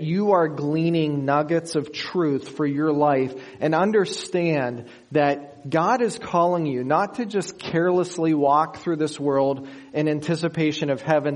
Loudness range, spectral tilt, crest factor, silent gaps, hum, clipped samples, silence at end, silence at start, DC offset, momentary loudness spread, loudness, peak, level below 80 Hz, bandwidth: 1 LU; -6.5 dB/octave; 18 dB; none; none; under 0.1%; 0 s; 0 s; under 0.1%; 7 LU; -23 LUFS; -4 dBFS; -66 dBFS; 11 kHz